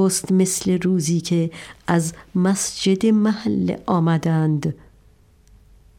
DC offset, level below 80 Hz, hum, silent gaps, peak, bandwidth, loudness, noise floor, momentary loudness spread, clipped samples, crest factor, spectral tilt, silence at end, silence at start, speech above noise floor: under 0.1%; -54 dBFS; none; none; -6 dBFS; 16.5 kHz; -20 LUFS; -53 dBFS; 7 LU; under 0.1%; 14 dB; -5.5 dB/octave; 1.25 s; 0 s; 33 dB